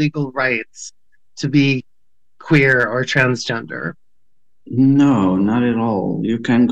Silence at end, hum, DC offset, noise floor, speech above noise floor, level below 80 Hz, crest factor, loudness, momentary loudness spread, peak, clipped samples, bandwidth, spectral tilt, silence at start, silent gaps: 0 s; none; 0.4%; -75 dBFS; 59 dB; -52 dBFS; 16 dB; -17 LUFS; 14 LU; -2 dBFS; under 0.1%; 8.4 kHz; -6.5 dB/octave; 0 s; none